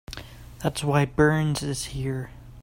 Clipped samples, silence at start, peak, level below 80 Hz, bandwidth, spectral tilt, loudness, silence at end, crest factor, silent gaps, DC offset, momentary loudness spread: under 0.1%; 0.1 s; -6 dBFS; -44 dBFS; 16 kHz; -5.5 dB/octave; -25 LUFS; 0 s; 20 dB; none; under 0.1%; 19 LU